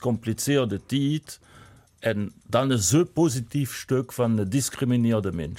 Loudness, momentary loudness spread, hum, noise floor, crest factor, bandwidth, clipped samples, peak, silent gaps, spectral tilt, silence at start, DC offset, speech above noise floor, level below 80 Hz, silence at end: -25 LUFS; 8 LU; none; -52 dBFS; 16 dB; 16.5 kHz; under 0.1%; -10 dBFS; none; -5.5 dB/octave; 0 s; under 0.1%; 27 dB; -54 dBFS; 0 s